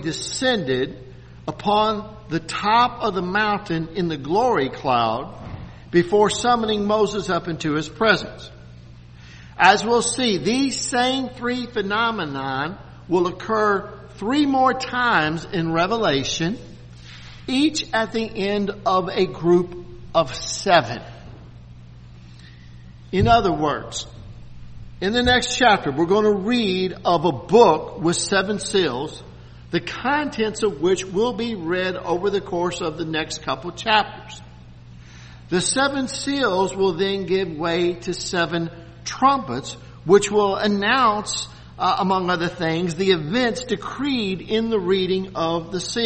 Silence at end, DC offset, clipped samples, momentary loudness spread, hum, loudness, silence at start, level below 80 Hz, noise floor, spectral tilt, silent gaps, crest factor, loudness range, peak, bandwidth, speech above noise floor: 0 s; under 0.1%; under 0.1%; 13 LU; none; -21 LUFS; 0 s; -46 dBFS; -42 dBFS; -4 dB/octave; none; 22 dB; 4 LU; 0 dBFS; 8.8 kHz; 22 dB